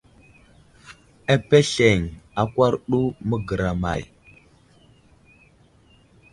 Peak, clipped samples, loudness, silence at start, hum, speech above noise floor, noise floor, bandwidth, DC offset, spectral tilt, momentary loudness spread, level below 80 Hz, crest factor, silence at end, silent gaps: -2 dBFS; under 0.1%; -21 LUFS; 0.9 s; none; 35 dB; -55 dBFS; 11.5 kHz; under 0.1%; -5.5 dB/octave; 13 LU; -44 dBFS; 22 dB; 2.25 s; none